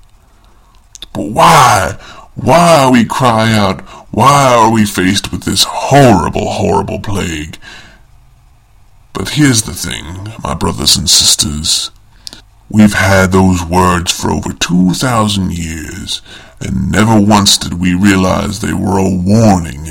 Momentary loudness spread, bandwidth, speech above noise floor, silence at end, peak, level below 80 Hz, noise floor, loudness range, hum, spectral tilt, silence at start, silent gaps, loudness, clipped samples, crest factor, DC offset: 16 LU; over 20 kHz; 33 dB; 0 s; 0 dBFS; -32 dBFS; -43 dBFS; 7 LU; none; -4 dB/octave; 1.15 s; none; -10 LUFS; 0.7%; 12 dB; under 0.1%